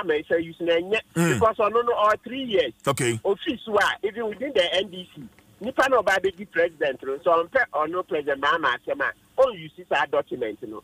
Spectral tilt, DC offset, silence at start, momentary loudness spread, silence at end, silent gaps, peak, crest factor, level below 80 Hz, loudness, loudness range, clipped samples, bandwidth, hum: -4.5 dB/octave; under 0.1%; 0 s; 8 LU; 0.05 s; none; -8 dBFS; 16 dB; -58 dBFS; -24 LUFS; 2 LU; under 0.1%; 15.5 kHz; none